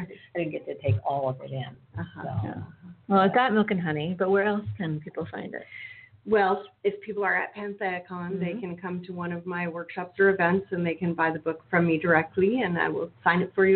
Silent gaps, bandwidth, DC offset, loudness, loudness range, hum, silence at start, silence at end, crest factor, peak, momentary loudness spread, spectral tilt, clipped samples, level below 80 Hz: none; 4.5 kHz; under 0.1%; -27 LUFS; 5 LU; none; 0 s; 0 s; 20 dB; -6 dBFS; 14 LU; -11 dB/octave; under 0.1%; -64 dBFS